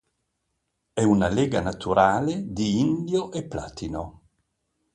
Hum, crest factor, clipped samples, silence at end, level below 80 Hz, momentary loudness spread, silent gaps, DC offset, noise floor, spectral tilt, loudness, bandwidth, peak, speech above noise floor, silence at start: none; 20 dB; under 0.1%; 0.85 s; -48 dBFS; 13 LU; none; under 0.1%; -77 dBFS; -6 dB/octave; -24 LUFS; 10.5 kHz; -4 dBFS; 54 dB; 0.95 s